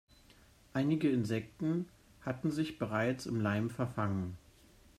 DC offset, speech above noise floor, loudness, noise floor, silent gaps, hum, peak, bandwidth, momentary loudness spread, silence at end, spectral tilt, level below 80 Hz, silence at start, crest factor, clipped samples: under 0.1%; 28 dB; -35 LUFS; -62 dBFS; none; none; -20 dBFS; 14.5 kHz; 11 LU; 0.6 s; -7 dB/octave; -64 dBFS; 0.75 s; 16 dB; under 0.1%